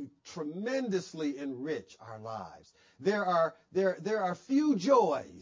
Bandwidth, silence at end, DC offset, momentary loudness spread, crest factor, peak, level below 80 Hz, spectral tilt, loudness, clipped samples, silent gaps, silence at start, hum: 7.6 kHz; 0 s; under 0.1%; 16 LU; 18 dB; -14 dBFS; -74 dBFS; -6 dB/octave; -31 LUFS; under 0.1%; none; 0 s; none